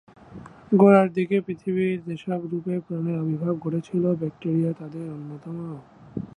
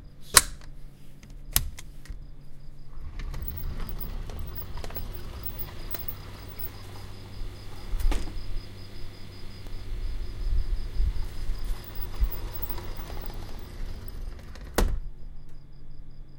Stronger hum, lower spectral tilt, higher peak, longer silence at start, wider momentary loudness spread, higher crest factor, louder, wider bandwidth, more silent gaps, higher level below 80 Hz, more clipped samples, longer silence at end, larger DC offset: neither; first, -9.5 dB/octave vs -2.5 dB/octave; second, -4 dBFS vs 0 dBFS; first, 0.3 s vs 0 s; about the same, 19 LU vs 20 LU; second, 20 dB vs 30 dB; first, -24 LUFS vs -32 LUFS; second, 9.2 kHz vs 17 kHz; neither; second, -62 dBFS vs -32 dBFS; neither; about the same, 0.1 s vs 0 s; neither